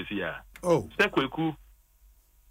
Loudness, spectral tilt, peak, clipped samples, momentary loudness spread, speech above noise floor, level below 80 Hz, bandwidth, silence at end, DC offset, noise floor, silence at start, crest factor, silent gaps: -28 LUFS; -5.5 dB/octave; -12 dBFS; under 0.1%; 10 LU; 32 dB; -56 dBFS; 16 kHz; 0.9 s; under 0.1%; -60 dBFS; 0 s; 20 dB; none